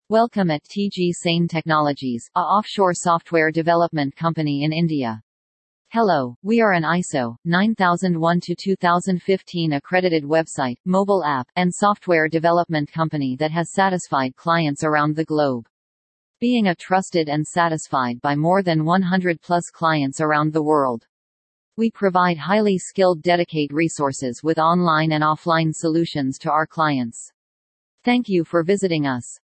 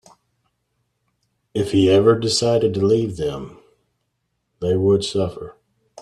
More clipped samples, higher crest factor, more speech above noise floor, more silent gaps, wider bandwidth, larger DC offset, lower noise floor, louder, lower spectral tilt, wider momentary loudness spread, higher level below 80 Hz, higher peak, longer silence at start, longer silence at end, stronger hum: neither; about the same, 18 dB vs 18 dB; first, over 70 dB vs 55 dB; first, 5.23-5.85 s, 6.36-6.42 s, 7.38-7.42 s, 10.80-10.84 s, 15.70-16.34 s, 21.09-21.72 s, 27.34-27.98 s vs none; second, 8.8 kHz vs 12.5 kHz; neither; first, under -90 dBFS vs -73 dBFS; about the same, -20 LUFS vs -19 LUFS; about the same, -6 dB/octave vs -5.5 dB/octave; second, 6 LU vs 17 LU; second, -64 dBFS vs -52 dBFS; about the same, -2 dBFS vs -4 dBFS; second, 0.1 s vs 1.55 s; first, 0.25 s vs 0 s; neither